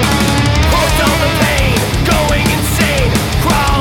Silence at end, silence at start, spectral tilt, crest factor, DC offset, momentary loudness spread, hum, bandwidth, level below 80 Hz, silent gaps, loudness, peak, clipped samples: 0 s; 0 s; -4.5 dB/octave; 10 dB; under 0.1%; 2 LU; none; 18 kHz; -20 dBFS; none; -12 LUFS; -2 dBFS; under 0.1%